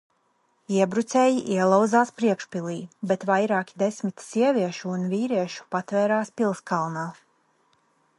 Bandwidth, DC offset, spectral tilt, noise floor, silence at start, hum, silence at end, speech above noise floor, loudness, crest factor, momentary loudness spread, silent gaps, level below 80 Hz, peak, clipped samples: 11.5 kHz; under 0.1%; -6 dB/octave; -68 dBFS; 0.7 s; none; 1.05 s; 44 dB; -24 LUFS; 20 dB; 10 LU; none; -74 dBFS; -6 dBFS; under 0.1%